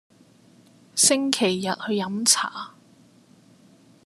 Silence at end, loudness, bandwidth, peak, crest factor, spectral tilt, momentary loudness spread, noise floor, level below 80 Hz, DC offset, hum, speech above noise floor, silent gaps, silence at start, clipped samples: 1.35 s; -21 LUFS; 14 kHz; -2 dBFS; 24 dB; -2 dB/octave; 13 LU; -55 dBFS; -72 dBFS; under 0.1%; none; 32 dB; none; 0.95 s; under 0.1%